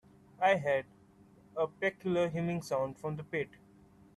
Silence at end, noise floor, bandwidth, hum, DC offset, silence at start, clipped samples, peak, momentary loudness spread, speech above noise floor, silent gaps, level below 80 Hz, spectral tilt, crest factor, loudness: 0.7 s; -61 dBFS; 13 kHz; none; under 0.1%; 0.4 s; under 0.1%; -16 dBFS; 11 LU; 28 dB; none; -70 dBFS; -6.5 dB/octave; 20 dB; -34 LUFS